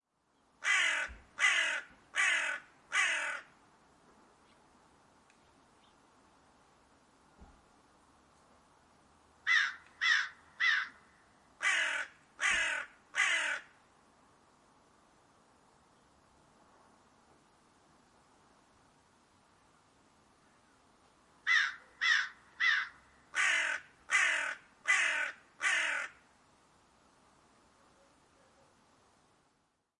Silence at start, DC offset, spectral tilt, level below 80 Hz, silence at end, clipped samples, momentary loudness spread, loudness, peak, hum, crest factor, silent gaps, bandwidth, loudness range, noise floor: 0.6 s; under 0.1%; 1.5 dB/octave; -72 dBFS; 3.9 s; under 0.1%; 11 LU; -32 LUFS; -16 dBFS; none; 22 dB; none; 11.5 kHz; 7 LU; -77 dBFS